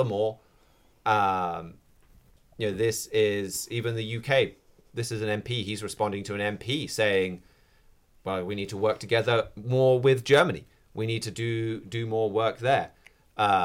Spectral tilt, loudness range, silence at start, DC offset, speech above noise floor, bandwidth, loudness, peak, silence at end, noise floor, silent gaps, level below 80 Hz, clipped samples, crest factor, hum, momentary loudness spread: -5 dB/octave; 4 LU; 0 s; under 0.1%; 34 dB; 17 kHz; -27 LUFS; -10 dBFS; 0 s; -61 dBFS; none; -60 dBFS; under 0.1%; 18 dB; none; 11 LU